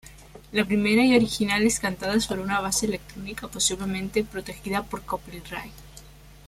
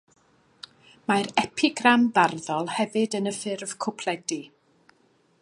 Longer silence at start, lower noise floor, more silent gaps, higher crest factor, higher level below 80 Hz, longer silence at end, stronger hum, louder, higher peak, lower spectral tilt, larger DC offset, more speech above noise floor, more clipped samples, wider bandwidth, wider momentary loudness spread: second, 0.05 s vs 1.1 s; second, -47 dBFS vs -64 dBFS; neither; about the same, 20 dB vs 24 dB; first, -48 dBFS vs -72 dBFS; second, 0 s vs 0.95 s; neither; about the same, -25 LUFS vs -25 LUFS; second, -6 dBFS vs -2 dBFS; about the same, -3.5 dB/octave vs -3.5 dB/octave; neither; second, 22 dB vs 39 dB; neither; first, 16 kHz vs 11.5 kHz; about the same, 16 LU vs 17 LU